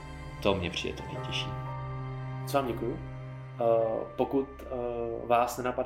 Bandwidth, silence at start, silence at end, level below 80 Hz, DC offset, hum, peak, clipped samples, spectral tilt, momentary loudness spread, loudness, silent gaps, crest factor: 16.5 kHz; 0 s; 0 s; -50 dBFS; under 0.1%; none; -10 dBFS; under 0.1%; -5.5 dB/octave; 11 LU; -32 LUFS; none; 22 dB